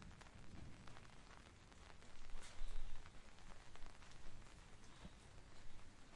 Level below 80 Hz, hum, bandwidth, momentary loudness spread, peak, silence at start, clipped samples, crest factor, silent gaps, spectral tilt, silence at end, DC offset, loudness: -54 dBFS; none; 11 kHz; 7 LU; -32 dBFS; 0 s; under 0.1%; 16 dB; none; -4 dB/octave; 0 s; under 0.1%; -62 LUFS